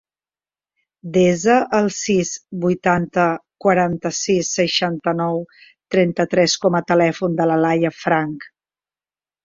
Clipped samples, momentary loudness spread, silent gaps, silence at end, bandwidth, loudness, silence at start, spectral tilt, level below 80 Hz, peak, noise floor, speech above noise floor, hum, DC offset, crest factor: under 0.1%; 7 LU; none; 0.95 s; 7.8 kHz; -18 LUFS; 1.05 s; -4.5 dB/octave; -56 dBFS; -2 dBFS; under -90 dBFS; over 72 dB; none; under 0.1%; 16 dB